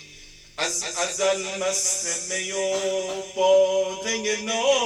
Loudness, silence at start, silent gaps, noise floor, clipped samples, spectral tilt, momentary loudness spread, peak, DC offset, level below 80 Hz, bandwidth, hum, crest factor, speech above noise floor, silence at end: -23 LUFS; 0 s; none; -47 dBFS; under 0.1%; -0.5 dB/octave; 8 LU; -8 dBFS; under 0.1%; -60 dBFS; 14.5 kHz; none; 16 dB; 23 dB; 0 s